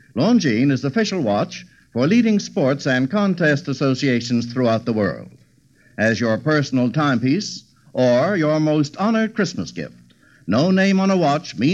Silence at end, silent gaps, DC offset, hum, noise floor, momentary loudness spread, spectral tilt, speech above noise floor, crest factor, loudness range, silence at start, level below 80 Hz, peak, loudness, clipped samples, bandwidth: 0 s; none; under 0.1%; none; -55 dBFS; 12 LU; -6 dB/octave; 37 dB; 14 dB; 2 LU; 0.15 s; -62 dBFS; -6 dBFS; -19 LUFS; under 0.1%; 8 kHz